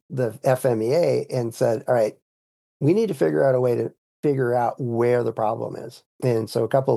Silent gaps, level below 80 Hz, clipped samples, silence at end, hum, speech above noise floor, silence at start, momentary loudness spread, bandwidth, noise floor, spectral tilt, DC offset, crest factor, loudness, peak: 2.22-2.80 s, 3.98-4.23 s, 6.06-6.19 s; -74 dBFS; under 0.1%; 0 s; none; over 69 dB; 0.1 s; 7 LU; 12.5 kHz; under -90 dBFS; -7.5 dB/octave; under 0.1%; 16 dB; -22 LUFS; -6 dBFS